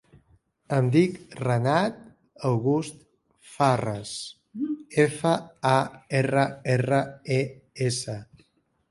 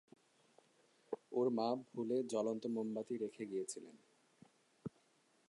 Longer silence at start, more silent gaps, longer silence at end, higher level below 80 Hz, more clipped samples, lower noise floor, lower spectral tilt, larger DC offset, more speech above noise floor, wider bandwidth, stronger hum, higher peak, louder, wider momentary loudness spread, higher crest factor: second, 0.7 s vs 1.1 s; neither; about the same, 0.65 s vs 0.6 s; first, -62 dBFS vs -90 dBFS; neither; second, -66 dBFS vs -75 dBFS; about the same, -6 dB/octave vs -5.5 dB/octave; neither; first, 42 dB vs 35 dB; about the same, 11.5 kHz vs 11 kHz; neither; first, -6 dBFS vs -24 dBFS; first, -26 LUFS vs -41 LUFS; second, 11 LU vs 16 LU; about the same, 20 dB vs 20 dB